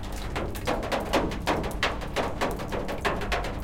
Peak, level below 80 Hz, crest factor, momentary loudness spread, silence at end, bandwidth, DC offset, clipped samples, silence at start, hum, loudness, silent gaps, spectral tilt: -10 dBFS; -36 dBFS; 18 dB; 5 LU; 0 s; 17 kHz; under 0.1%; under 0.1%; 0 s; none; -29 LUFS; none; -4.5 dB/octave